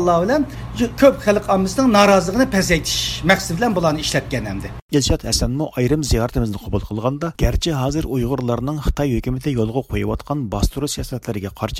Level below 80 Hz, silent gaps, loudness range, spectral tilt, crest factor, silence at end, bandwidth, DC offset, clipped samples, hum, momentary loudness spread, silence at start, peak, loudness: -30 dBFS; 4.82-4.89 s; 6 LU; -5 dB/octave; 18 dB; 0 s; 16.5 kHz; under 0.1%; under 0.1%; none; 10 LU; 0 s; 0 dBFS; -19 LUFS